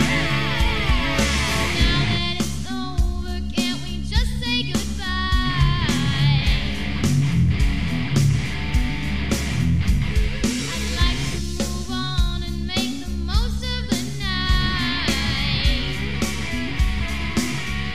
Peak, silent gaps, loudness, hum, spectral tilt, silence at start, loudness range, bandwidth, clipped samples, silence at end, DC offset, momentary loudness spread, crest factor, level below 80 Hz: -6 dBFS; none; -22 LUFS; none; -4.5 dB/octave; 0 s; 3 LU; 16 kHz; under 0.1%; 0 s; 3%; 6 LU; 16 dB; -26 dBFS